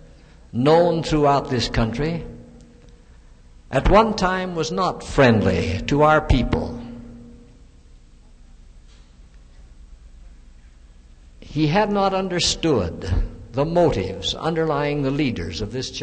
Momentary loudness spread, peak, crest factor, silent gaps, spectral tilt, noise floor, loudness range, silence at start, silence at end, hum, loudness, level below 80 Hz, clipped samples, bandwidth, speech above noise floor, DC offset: 12 LU; -2 dBFS; 20 dB; none; -5.5 dB/octave; -47 dBFS; 7 LU; 0 s; 0 s; none; -20 LUFS; -34 dBFS; under 0.1%; 9.2 kHz; 28 dB; under 0.1%